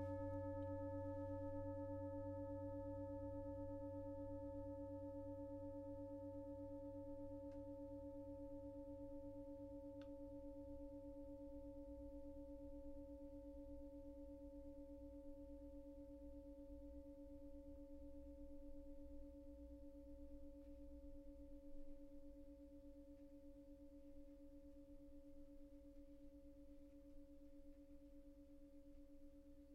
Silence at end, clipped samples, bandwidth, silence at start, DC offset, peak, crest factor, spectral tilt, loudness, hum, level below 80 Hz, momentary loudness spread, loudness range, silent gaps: 0 s; under 0.1%; 7 kHz; 0 s; under 0.1%; -38 dBFS; 16 dB; -10 dB/octave; -56 LUFS; 50 Hz at -90 dBFS; -64 dBFS; 14 LU; 13 LU; none